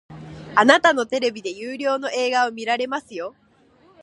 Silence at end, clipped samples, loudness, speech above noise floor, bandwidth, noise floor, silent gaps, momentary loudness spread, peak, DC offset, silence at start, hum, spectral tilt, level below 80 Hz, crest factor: 0.75 s; under 0.1%; -20 LUFS; 36 dB; 11 kHz; -56 dBFS; none; 18 LU; 0 dBFS; under 0.1%; 0.1 s; none; -3 dB/octave; -62 dBFS; 22 dB